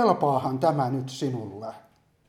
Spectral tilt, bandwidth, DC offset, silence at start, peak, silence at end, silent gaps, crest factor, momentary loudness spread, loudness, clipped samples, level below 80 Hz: -7 dB/octave; 14.5 kHz; under 0.1%; 0 s; -6 dBFS; 0.5 s; none; 20 dB; 15 LU; -26 LUFS; under 0.1%; -68 dBFS